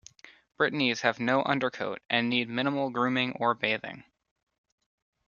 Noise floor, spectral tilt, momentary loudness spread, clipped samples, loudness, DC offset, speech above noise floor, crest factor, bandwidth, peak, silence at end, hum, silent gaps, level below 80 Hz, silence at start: -54 dBFS; -5 dB/octave; 6 LU; under 0.1%; -28 LUFS; under 0.1%; 26 dB; 24 dB; 7.2 kHz; -6 dBFS; 1.25 s; none; none; -72 dBFS; 0.25 s